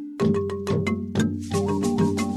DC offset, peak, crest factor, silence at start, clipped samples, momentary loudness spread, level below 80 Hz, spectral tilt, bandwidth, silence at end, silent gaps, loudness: under 0.1%; -10 dBFS; 14 dB; 0 s; under 0.1%; 3 LU; -54 dBFS; -6.5 dB/octave; 13.5 kHz; 0 s; none; -24 LUFS